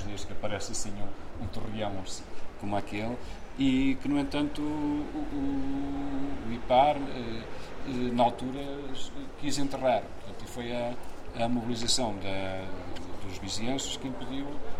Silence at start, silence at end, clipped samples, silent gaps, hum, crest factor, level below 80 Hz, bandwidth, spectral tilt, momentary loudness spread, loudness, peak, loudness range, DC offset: 0 s; 0 s; under 0.1%; none; none; 18 dB; -44 dBFS; 14 kHz; -4.5 dB/octave; 14 LU; -32 LUFS; -10 dBFS; 4 LU; under 0.1%